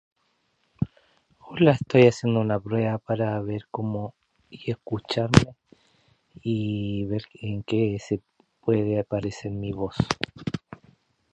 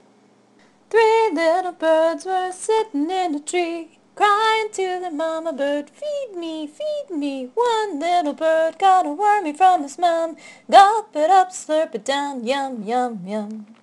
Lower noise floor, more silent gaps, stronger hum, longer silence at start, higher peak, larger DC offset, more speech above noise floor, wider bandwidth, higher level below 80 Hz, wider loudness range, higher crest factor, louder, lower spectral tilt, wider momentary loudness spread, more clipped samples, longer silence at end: first, -70 dBFS vs -55 dBFS; neither; neither; second, 0.8 s vs 0.95 s; about the same, 0 dBFS vs 0 dBFS; neither; first, 46 dB vs 35 dB; second, 10.5 kHz vs 12 kHz; first, -48 dBFS vs -70 dBFS; about the same, 5 LU vs 6 LU; first, 26 dB vs 20 dB; second, -26 LUFS vs -20 LUFS; first, -7 dB/octave vs -3 dB/octave; about the same, 14 LU vs 12 LU; neither; first, 0.6 s vs 0.2 s